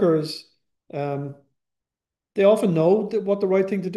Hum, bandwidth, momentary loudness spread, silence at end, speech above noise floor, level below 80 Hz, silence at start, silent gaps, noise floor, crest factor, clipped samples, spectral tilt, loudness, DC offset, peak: none; 12.5 kHz; 16 LU; 0 s; 68 dB; -72 dBFS; 0 s; none; -89 dBFS; 18 dB; under 0.1%; -7.5 dB/octave; -21 LUFS; under 0.1%; -4 dBFS